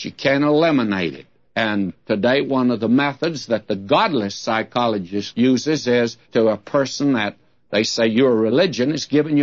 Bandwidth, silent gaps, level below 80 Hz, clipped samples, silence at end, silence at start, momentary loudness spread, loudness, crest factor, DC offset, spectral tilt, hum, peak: 7.6 kHz; none; -62 dBFS; under 0.1%; 0 s; 0 s; 7 LU; -19 LUFS; 16 dB; 0.1%; -5 dB/octave; none; -4 dBFS